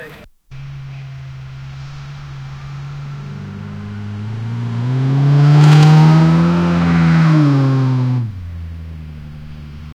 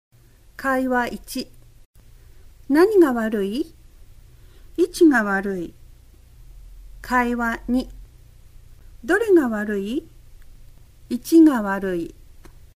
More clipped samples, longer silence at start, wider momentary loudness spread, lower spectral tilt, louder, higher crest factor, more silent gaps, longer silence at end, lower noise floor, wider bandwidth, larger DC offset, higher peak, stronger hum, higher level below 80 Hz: neither; second, 0 s vs 0.6 s; first, 23 LU vs 17 LU; first, -8 dB/octave vs -5.5 dB/octave; first, -12 LUFS vs -20 LUFS; about the same, 14 dB vs 18 dB; second, none vs 1.85-1.93 s; second, 0.1 s vs 0.65 s; second, -37 dBFS vs -47 dBFS; second, 8 kHz vs 15.5 kHz; neither; first, 0 dBFS vs -6 dBFS; neither; first, -40 dBFS vs -46 dBFS